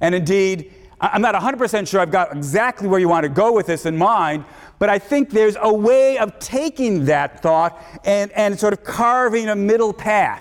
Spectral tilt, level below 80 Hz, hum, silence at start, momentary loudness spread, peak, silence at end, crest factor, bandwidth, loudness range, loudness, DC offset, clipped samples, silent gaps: -5.5 dB/octave; -52 dBFS; none; 0 s; 6 LU; -6 dBFS; 0 s; 12 dB; 17 kHz; 1 LU; -17 LUFS; under 0.1%; under 0.1%; none